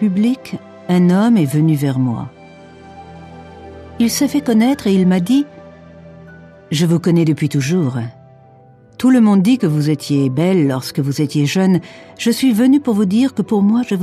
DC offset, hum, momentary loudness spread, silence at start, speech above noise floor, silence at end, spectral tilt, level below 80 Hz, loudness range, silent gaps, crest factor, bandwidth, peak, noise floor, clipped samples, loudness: under 0.1%; none; 15 LU; 0 s; 31 dB; 0 s; -6.5 dB/octave; -54 dBFS; 4 LU; none; 12 dB; 14 kHz; -4 dBFS; -45 dBFS; under 0.1%; -15 LUFS